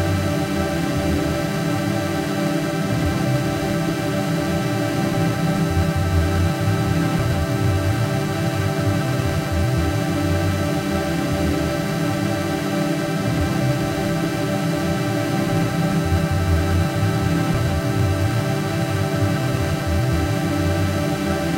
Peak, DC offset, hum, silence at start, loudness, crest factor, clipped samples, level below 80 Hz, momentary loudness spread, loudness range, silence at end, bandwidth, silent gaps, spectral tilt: -6 dBFS; under 0.1%; none; 0 s; -21 LUFS; 14 dB; under 0.1%; -34 dBFS; 2 LU; 1 LU; 0 s; 16 kHz; none; -6 dB/octave